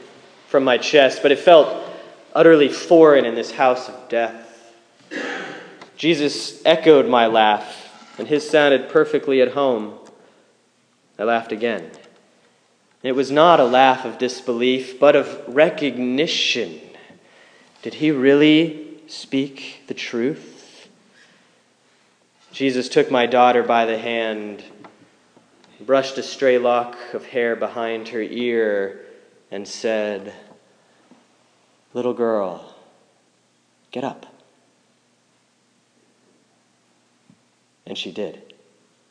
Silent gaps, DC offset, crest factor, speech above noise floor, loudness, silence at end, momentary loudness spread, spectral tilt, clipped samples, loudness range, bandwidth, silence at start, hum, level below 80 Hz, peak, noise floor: none; under 0.1%; 20 dB; 44 dB; -18 LUFS; 0.75 s; 20 LU; -4.5 dB/octave; under 0.1%; 13 LU; 10 kHz; 0.55 s; none; -78 dBFS; 0 dBFS; -62 dBFS